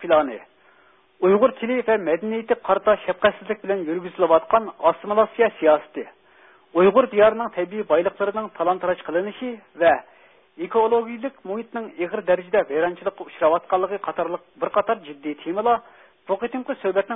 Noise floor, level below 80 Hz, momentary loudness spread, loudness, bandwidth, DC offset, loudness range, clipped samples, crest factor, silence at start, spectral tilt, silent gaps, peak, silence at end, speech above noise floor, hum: -57 dBFS; -60 dBFS; 12 LU; -22 LUFS; 3.9 kHz; under 0.1%; 4 LU; under 0.1%; 18 dB; 0 s; -10 dB/octave; none; -4 dBFS; 0 s; 35 dB; none